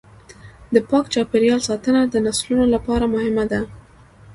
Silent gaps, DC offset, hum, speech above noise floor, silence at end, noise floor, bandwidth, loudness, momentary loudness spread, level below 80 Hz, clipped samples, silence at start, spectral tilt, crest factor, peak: none; under 0.1%; none; 28 dB; 0 s; -46 dBFS; 11.5 kHz; -19 LUFS; 4 LU; -42 dBFS; under 0.1%; 0.3 s; -4.5 dB/octave; 18 dB; 0 dBFS